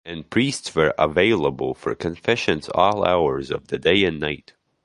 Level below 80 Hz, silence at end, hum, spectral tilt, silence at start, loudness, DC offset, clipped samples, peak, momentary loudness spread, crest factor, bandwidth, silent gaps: -46 dBFS; 0.5 s; none; -5 dB/octave; 0.05 s; -21 LUFS; under 0.1%; under 0.1%; -2 dBFS; 9 LU; 20 dB; 11.5 kHz; none